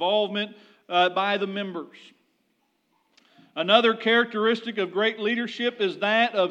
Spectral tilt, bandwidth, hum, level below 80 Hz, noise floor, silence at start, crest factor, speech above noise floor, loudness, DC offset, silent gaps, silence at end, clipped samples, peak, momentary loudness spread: -5 dB/octave; 8.8 kHz; none; under -90 dBFS; -71 dBFS; 0 s; 22 dB; 47 dB; -24 LUFS; under 0.1%; none; 0 s; under 0.1%; -4 dBFS; 13 LU